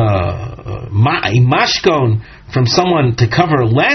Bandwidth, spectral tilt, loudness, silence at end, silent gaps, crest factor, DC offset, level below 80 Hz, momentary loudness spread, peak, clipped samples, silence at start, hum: 6.4 kHz; -4.5 dB/octave; -13 LUFS; 0 s; none; 12 dB; under 0.1%; -38 dBFS; 9 LU; 0 dBFS; under 0.1%; 0 s; none